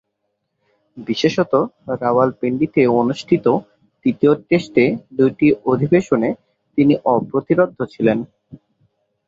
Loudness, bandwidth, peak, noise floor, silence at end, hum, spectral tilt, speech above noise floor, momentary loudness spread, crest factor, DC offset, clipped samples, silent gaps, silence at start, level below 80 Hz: -17 LUFS; 7.8 kHz; 0 dBFS; -73 dBFS; 0.7 s; none; -7.5 dB/octave; 57 dB; 8 LU; 16 dB; under 0.1%; under 0.1%; none; 0.95 s; -56 dBFS